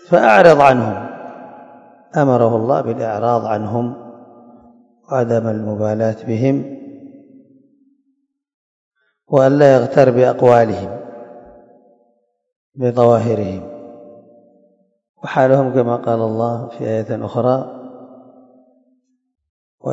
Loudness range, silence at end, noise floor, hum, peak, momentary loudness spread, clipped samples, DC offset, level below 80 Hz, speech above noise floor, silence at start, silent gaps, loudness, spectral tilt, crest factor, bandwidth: 8 LU; 0 s; -67 dBFS; none; 0 dBFS; 22 LU; 0.2%; under 0.1%; -58 dBFS; 53 dB; 0.1 s; 8.54-8.91 s, 12.56-12.70 s, 15.09-15.14 s, 19.49-19.78 s; -15 LUFS; -8 dB/octave; 18 dB; 8.2 kHz